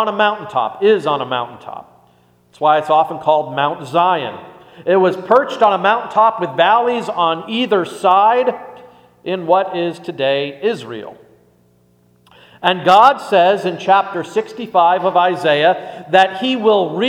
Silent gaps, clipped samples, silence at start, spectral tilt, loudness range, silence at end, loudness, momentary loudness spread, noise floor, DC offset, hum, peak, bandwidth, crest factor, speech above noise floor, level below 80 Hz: none; under 0.1%; 0 s; -5.5 dB/octave; 7 LU; 0 s; -15 LUFS; 11 LU; -54 dBFS; under 0.1%; none; 0 dBFS; 14.5 kHz; 16 dB; 39 dB; -66 dBFS